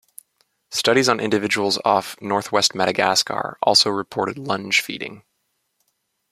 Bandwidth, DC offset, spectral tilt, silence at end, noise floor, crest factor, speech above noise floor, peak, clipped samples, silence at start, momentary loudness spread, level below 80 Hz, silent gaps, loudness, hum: 16 kHz; under 0.1%; -2.5 dB/octave; 1.15 s; -72 dBFS; 20 dB; 52 dB; -2 dBFS; under 0.1%; 0.7 s; 10 LU; -64 dBFS; none; -19 LUFS; none